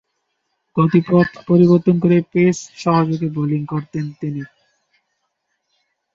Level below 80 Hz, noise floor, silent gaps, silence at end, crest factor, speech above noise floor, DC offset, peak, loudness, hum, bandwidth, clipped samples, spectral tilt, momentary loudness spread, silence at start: -56 dBFS; -72 dBFS; none; 1.7 s; 16 dB; 56 dB; under 0.1%; -2 dBFS; -17 LUFS; none; 7.6 kHz; under 0.1%; -8 dB/octave; 14 LU; 0.75 s